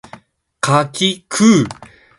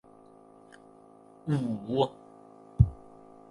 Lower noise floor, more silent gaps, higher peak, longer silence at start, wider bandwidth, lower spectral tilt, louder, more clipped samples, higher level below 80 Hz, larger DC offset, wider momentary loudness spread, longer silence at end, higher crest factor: second, -42 dBFS vs -55 dBFS; neither; first, 0 dBFS vs -6 dBFS; second, 0.65 s vs 1.45 s; about the same, 11.5 kHz vs 11 kHz; second, -4.5 dB/octave vs -9 dB/octave; first, -15 LUFS vs -30 LUFS; neither; second, -52 dBFS vs -42 dBFS; neither; second, 9 LU vs 26 LU; second, 0.35 s vs 0.55 s; second, 16 dB vs 26 dB